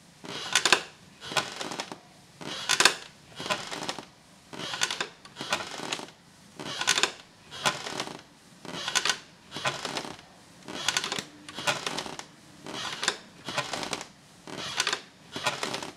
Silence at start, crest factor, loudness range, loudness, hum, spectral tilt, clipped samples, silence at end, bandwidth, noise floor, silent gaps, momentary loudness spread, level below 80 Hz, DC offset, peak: 0 s; 32 dB; 5 LU; -29 LUFS; none; -1 dB/octave; under 0.1%; 0 s; 16 kHz; -53 dBFS; none; 20 LU; -70 dBFS; under 0.1%; -2 dBFS